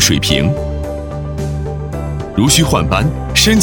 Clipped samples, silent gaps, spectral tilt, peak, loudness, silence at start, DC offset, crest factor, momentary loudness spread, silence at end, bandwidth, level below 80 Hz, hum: under 0.1%; none; -4 dB/octave; 0 dBFS; -15 LUFS; 0 s; under 0.1%; 14 dB; 12 LU; 0 s; over 20 kHz; -24 dBFS; none